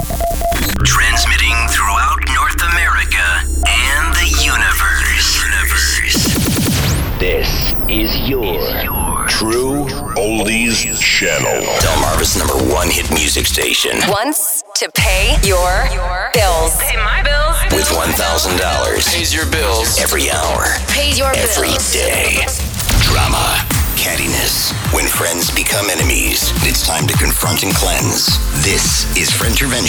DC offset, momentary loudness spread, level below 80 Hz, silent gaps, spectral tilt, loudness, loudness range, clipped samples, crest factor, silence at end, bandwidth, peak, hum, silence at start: under 0.1%; 4 LU; -20 dBFS; none; -2.5 dB/octave; -13 LUFS; 2 LU; under 0.1%; 12 dB; 0 s; over 20 kHz; 0 dBFS; none; 0 s